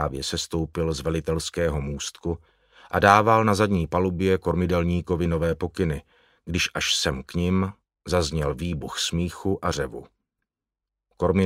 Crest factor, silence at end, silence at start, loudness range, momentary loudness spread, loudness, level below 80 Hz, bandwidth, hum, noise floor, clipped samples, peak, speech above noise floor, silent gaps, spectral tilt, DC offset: 24 dB; 0 s; 0 s; 6 LU; 11 LU; -24 LUFS; -40 dBFS; 16 kHz; none; -88 dBFS; under 0.1%; 0 dBFS; 64 dB; none; -5 dB/octave; under 0.1%